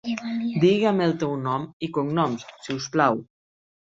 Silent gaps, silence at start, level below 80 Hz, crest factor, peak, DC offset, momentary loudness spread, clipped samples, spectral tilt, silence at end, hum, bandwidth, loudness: 1.73-1.80 s; 0.05 s; -64 dBFS; 20 dB; -4 dBFS; under 0.1%; 11 LU; under 0.1%; -6 dB/octave; 0.65 s; none; 7.8 kHz; -24 LUFS